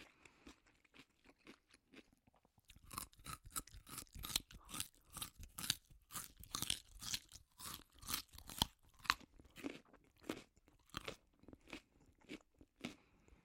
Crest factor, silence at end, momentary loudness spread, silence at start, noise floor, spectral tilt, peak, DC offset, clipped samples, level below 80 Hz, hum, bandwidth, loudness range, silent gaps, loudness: 40 dB; 0.1 s; 23 LU; 0 s; -75 dBFS; -1.5 dB/octave; -12 dBFS; under 0.1%; under 0.1%; -66 dBFS; none; 16.5 kHz; 10 LU; none; -47 LUFS